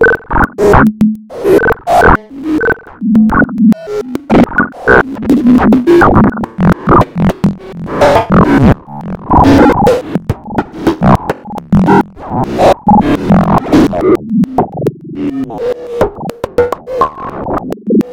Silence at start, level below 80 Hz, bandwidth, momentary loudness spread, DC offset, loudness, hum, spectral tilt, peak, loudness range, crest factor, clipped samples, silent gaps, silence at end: 0 s; -26 dBFS; 17 kHz; 11 LU; under 0.1%; -10 LUFS; none; -7.5 dB/octave; 0 dBFS; 4 LU; 10 dB; 0.2%; none; 0 s